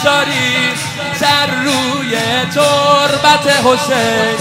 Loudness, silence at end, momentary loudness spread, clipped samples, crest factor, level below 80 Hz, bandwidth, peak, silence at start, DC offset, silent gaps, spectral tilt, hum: -12 LUFS; 0 s; 6 LU; under 0.1%; 12 dB; -50 dBFS; 16.5 kHz; 0 dBFS; 0 s; under 0.1%; none; -3 dB/octave; none